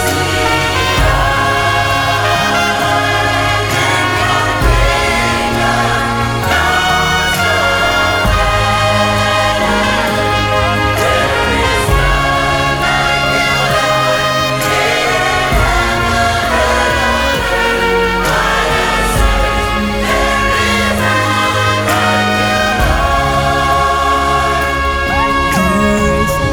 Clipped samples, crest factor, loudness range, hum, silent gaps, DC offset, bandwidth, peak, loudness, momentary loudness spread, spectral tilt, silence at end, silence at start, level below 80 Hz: under 0.1%; 12 dB; 1 LU; none; none; under 0.1%; 18 kHz; 0 dBFS; -12 LUFS; 2 LU; -4 dB/octave; 0 s; 0 s; -22 dBFS